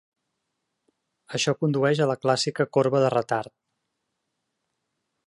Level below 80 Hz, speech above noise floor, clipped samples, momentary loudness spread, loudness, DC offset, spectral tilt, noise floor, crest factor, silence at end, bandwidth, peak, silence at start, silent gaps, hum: -72 dBFS; 56 dB; under 0.1%; 8 LU; -24 LUFS; under 0.1%; -5 dB/octave; -79 dBFS; 20 dB; 1.85 s; 11.5 kHz; -8 dBFS; 1.3 s; none; none